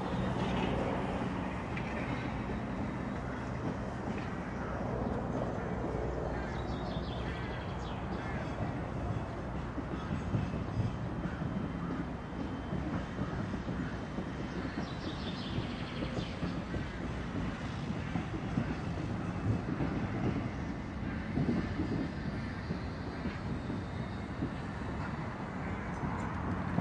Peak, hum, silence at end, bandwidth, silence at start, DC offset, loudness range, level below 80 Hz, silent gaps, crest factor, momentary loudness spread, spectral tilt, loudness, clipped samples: -18 dBFS; none; 0 s; 10.5 kHz; 0 s; under 0.1%; 3 LU; -46 dBFS; none; 18 dB; 5 LU; -7.5 dB/octave; -37 LUFS; under 0.1%